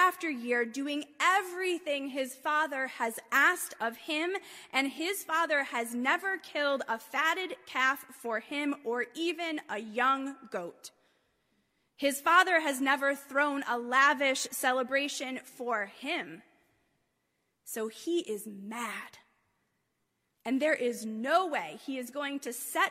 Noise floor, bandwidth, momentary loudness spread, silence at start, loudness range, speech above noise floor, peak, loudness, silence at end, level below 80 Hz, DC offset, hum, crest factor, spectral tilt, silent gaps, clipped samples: -80 dBFS; 16 kHz; 13 LU; 0 s; 10 LU; 48 dB; -10 dBFS; -31 LUFS; 0 s; -86 dBFS; under 0.1%; none; 22 dB; -1.5 dB/octave; none; under 0.1%